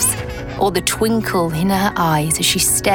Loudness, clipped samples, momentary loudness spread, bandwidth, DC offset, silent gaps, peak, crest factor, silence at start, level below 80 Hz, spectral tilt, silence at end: -16 LUFS; under 0.1%; 6 LU; 19 kHz; under 0.1%; none; -2 dBFS; 14 dB; 0 s; -36 dBFS; -3.5 dB/octave; 0 s